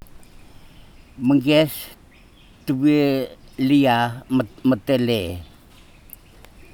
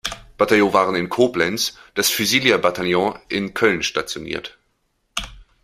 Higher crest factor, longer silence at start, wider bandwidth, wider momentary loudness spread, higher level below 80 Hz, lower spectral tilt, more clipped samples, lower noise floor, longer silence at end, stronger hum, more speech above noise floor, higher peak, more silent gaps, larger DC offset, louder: about the same, 18 dB vs 20 dB; about the same, 0.15 s vs 0.05 s; first, 19 kHz vs 16 kHz; about the same, 16 LU vs 14 LU; about the same, -50 dBFS vs -48 dBFS; first, -6.5 dB/octave vs -3 dB/octave; neither; second, -49 dBFS vs -68 dBFS; first, 1.3 s vs 0.2 s; neither; second, 30 dB vs 49 dB; about the same, -4 dBFS vs -2 dBFS; neither; neither; about the same, -20 LUFS vs -19 LUFS